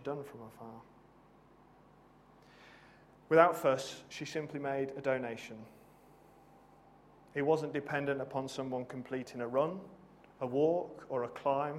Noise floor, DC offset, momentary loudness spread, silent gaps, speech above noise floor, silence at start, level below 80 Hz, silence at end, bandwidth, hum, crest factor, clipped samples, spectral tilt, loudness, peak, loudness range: -62 dBFS; under 0.1%; 20 LU; none; 28 dB; 0 s; -74 dBFS; 0 s; 15.5 kHz; none; 26 dB; under 0.1%; -6 dB/octave; -35 LUFS; -10 dBFS; 7 LU